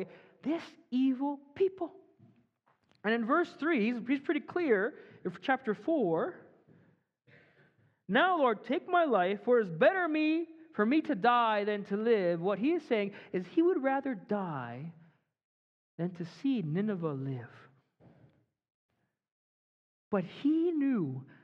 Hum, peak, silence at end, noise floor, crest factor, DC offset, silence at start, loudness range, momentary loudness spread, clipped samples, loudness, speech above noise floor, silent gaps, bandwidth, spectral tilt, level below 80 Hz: none; -14 dBFS; 0.2 s; -73 dBFS; 20 dB; under 0.1%; 0 s; 9 LU; 11 LU; under 0.1%; -31 LUFS; 42 dB; 15.44-15.98 s, 18.70-18.89 s, 19.32-20.11 s; 7 kHz; -8 dB/octave; -84 dBFS